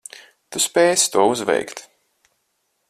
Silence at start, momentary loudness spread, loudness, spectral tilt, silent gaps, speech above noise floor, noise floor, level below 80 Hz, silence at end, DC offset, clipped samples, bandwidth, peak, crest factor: 0.5 s; 20 LU; -18 LUFS; -2 dB/octave; none; 52 dB; -71 dBFS; -64 dBFS; 1.1 s; under 0.1%; under 0.1%; 14.5 kHz; -2 dBFS; 18 dB